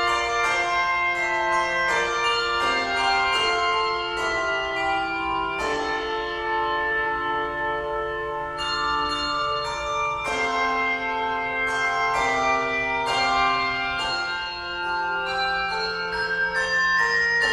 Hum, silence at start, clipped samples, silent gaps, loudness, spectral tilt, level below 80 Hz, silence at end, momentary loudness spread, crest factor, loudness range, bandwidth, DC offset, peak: none; 0 s; under 0.1%; none; -23 LUFS; -2.5 dB/octave; -48 dBFS; 0 s; 6 LU; 16 dB; 4 LU; 13.5 kHz; under 0.1%; -8 dBFS